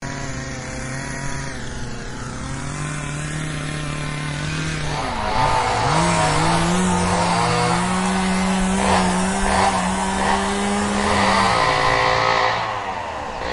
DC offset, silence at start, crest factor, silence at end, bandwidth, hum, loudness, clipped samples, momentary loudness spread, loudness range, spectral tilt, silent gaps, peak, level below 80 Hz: under 0.1%; 0 s; 18 dB; 0 s; 11.5 kHz; none; -20 LUFS; under 0.1%; 12 LU; 9 LU; -4 dB/octave; none; -4 dBFS; -34 dBFS